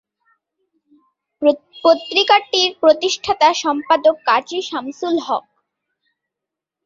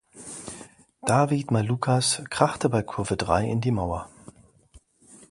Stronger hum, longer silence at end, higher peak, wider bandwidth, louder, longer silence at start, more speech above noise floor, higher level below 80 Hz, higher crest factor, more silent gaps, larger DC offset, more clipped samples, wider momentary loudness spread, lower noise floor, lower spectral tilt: neither; first, 1.45 s vs 0.15 s; about the same, -2 dBFS vs -2 dBFS; second, 7.6 kHz vs 11.5 kHz; first, -16 LUFS vs -25 LUFS; first, 1.4 s vs 0.15 s; first, 68 dB vs 32 dB; second, -62 dBFS vs -48 dBFS; second, 18 dB vs 24 dB; neither; neither; neither; second, 10 LU vs 16 LU; first, -84 dBFS vs -56 dBFS; second, -1.5 dB/octave vs -5 dB/octave